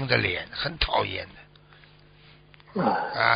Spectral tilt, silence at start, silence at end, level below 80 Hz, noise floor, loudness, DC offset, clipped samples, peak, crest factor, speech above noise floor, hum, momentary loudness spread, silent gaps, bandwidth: -2 dB/octave; 0 s; 0 s; -44 dBFS; -53 dBFS; -27 LUFS; under 0.1%; under 0.1%; -4 dBFS; 24 dB; 28 dB; 50 Hz at -55 dBFS; 12 LU; none; 5.6 kHz